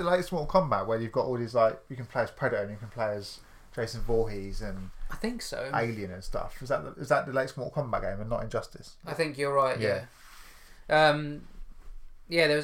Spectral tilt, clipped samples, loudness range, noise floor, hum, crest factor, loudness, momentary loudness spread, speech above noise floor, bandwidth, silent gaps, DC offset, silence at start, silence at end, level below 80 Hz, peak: -5.5 dB/octave; under 0.1%; 5 LU; -49 dBFS; none; 20 dB; -30 LUFS; 14 LU; 20 dB; 16.5 kHz; none; under 0.1%; 0 s; 0 s; -44 dBFS; -10 dBFS